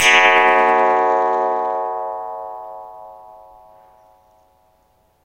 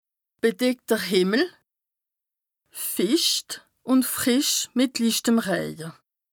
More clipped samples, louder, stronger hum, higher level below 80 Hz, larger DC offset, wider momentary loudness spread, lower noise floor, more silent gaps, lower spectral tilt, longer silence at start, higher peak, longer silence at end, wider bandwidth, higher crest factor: neither; first, -15 LUFS vs -23 LUFS; neither; first, -62 dBFS vs -70 dBFS; neither; first, 23 LU vs 13 LU; second, -59 dBFS vs -87 dBFS; neither; second, -1 dB/octave vs -3 dB/octave; second, 0 s vs 0.45 s; first, 0 dBFS vs -8 dBFS; first, 2.05 s vs 0.4 s; second, 16 kHz vs over 20 kHz; about the same, 18 dB vs 16 dB